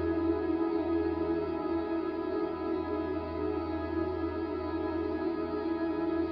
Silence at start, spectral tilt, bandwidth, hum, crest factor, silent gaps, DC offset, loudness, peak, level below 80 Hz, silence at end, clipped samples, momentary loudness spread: 0 s; -10 dB/octave; 5.4 kHz; none; 14 dB; none; under 0.1%; -33 LUFS; -18 dBFS; -50 dBFS; 0 s; under 0.1%; 4 LU